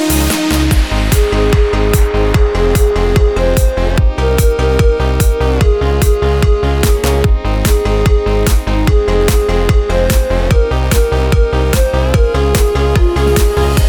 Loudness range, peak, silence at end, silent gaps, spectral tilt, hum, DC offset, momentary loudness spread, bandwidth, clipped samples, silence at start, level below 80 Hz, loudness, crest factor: 0 LU; 0 dBFS; 0 s; none; -5.5 dB/octave; none; 0.8%; 1 LU; 19.5 kHz; under 0.1%; 0 s; -12 dBFS; -12 LUFS; 10 dB